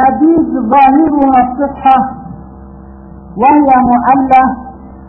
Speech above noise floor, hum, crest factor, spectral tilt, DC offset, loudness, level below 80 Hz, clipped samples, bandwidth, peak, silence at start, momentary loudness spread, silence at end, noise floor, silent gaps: 24 dB; none; 10 dB; -9 dB/octave; under 0.1%; -9 LUFS; -36 dBFS; 0.1%; 4.3 kHz; 0 dBFS; 0 s; 18 LU; 0.05 s; -31 dBFS; none